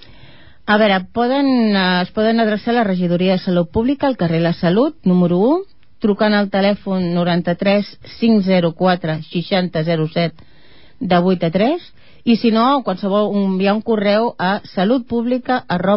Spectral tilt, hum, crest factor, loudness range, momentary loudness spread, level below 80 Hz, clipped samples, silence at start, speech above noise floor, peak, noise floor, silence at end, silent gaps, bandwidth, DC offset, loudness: -11.5 dB/octave; none; 14 dB; 2 LU; 5 LU; -50 dBFS; under 0.1%; 0.65 s; 33 dB; -2 dBFS; -49 dBFS; 0 s; none; 5.8 kHz; 0.8%; -16 LUFS